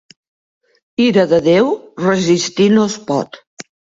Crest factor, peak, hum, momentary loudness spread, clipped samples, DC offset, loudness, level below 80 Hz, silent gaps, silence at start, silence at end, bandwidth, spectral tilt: 16 dB; 0 dBFS; none; 10 LU; under 0.1%; under 0.1%; -14 LUFS; -56 dBFS; 3.47-3.57 s; 1 s; 0.35 s; 7.8 kHz; -5 dB/octave